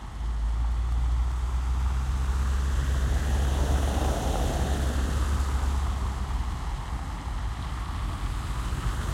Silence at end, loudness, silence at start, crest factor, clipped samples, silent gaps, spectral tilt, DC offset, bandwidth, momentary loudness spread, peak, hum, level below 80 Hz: 0 s; -29 LUFS; 0 s; 12 dB; under 0.1%; none; -5.5 dB/octave; under 0.1%; 14 kHz; 7 LU; -14 dBFS; none; -28 dBFS